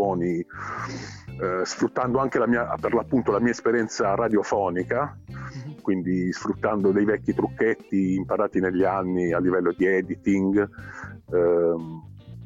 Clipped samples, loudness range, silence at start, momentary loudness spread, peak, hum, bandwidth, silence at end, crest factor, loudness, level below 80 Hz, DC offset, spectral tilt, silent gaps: under 0.1%; 2 LU; 0 s; 12 LU; -10 dBFS; none; 7.8 kHz; 0 s; 14 dB; -24 LUFS; -52 dBFS; under 0.1%; -6.5 dB/octave; none